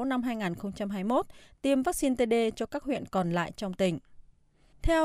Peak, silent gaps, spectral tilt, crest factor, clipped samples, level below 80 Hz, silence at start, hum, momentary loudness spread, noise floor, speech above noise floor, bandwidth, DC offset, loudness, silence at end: -14 dBFS; none; -5.5 dB/octave; 16 dB; under 0.1%; -44 dBFS; 0 s; none; 8 LU; -62 dBFS; 32 dB; 15.5 kHz; under 0.1%; -30 LUFS; 0 s